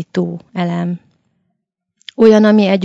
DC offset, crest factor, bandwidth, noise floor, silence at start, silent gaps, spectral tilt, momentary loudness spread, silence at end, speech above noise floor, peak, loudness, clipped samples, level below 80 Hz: under 0.1%; 14 dB; 7.6 kHz; -72 dBFS; 0 s; none; -7.5 dB/octave; 16 LU; 0 s; 60 dB; 0 dBFS; -13 LUFS; 0.3%; -60 dBFS